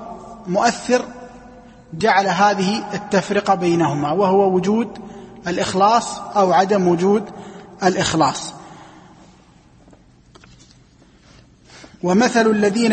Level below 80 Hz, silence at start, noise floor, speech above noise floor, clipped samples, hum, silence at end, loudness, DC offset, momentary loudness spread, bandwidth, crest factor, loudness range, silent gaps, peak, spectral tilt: -54 dBFS; 0 s; -50 dBFS; 33 dB; under 0.1%; none; 0 s; -18 LUFS; under 0.1%; 19 LU; 8.8 kHz; 18 dB; 6 LU; none; -2 dBFS; -5 dB/octave